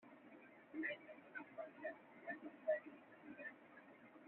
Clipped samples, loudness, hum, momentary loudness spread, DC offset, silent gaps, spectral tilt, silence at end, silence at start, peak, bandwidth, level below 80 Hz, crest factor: under 0.1%; -50 LUFS; none; 19 LU; under 0.1%; none; -2.5 dB/octave; 0 s; 0 s; -30 dBFS; 4 kHz; under -90 dBFS; 22 dB